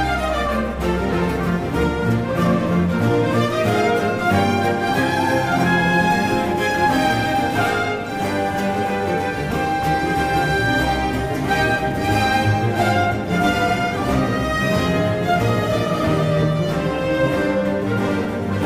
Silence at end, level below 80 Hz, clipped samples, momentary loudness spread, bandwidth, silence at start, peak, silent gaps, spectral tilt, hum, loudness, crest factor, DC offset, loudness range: 0 s; -36 dBFS; under 0.1%; 4 LU; 16 kHz; 0 s; -4 dBFS; none; -6 dB/octave; none; -19 LUFS; 14 dB; under 0.1%; 2 LU